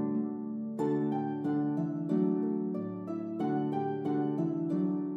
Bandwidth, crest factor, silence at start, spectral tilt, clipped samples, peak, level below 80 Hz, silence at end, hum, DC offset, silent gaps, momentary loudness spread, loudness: 7.6 kHz; 14 dB; 0 s; -10 dB/octave; under 0.1%; -18 dBFS; -82 dBFS; 0 s; none; under 0.1%; none; 7 LU; -33 LUFS